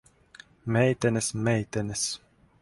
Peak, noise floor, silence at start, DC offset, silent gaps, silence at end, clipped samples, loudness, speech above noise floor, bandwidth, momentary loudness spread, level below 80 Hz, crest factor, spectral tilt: -10 dBFS; -53 dBFS; 0.65 s; under 0.1%; none; 0.45 s; under 0.1%; -27 LUFS; 27 dB; 11.5 kHz; 9 LU; -56 dBFS; 18 dB; -5 dB/octave